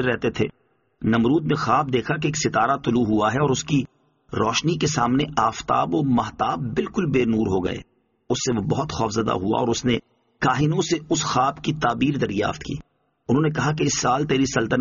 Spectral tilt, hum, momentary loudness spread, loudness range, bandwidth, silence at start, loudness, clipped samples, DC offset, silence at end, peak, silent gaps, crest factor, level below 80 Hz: -5 dB/octave; none; 5 LU; 2 LU; 7.4 kHz; 0 s; -22 LUFS; under 0.1%; under 0.1%; 0 s; -6 dBFS; none; 16 dB; -48 dBFS